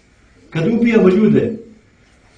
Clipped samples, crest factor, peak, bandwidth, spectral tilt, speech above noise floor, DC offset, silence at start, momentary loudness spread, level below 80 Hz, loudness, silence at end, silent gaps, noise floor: under 0.1%; 16 dB; 0 dBFS; 7.6 kHz; -8.5 dB/octave; 38 dB; under 0.1%; 0.55 s; 14 LU; -50 dBFS; -14 LUFS; 0.75 s; none; -50 dBFS